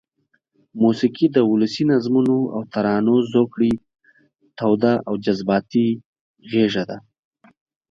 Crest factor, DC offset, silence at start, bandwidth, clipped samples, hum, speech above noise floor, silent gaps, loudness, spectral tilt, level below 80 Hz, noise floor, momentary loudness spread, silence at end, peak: 16 dB; under 0.1%; 0.75 s; 7.4 kHz; under 0.1%; none; 50 dB; 6.05-6.13 s, 6.21-6.34 s; -19 LUFS; -7.5 dB/octave; -56 dBFS; -68 dBFS; 8 LU; 0.9 s; -4 dBFS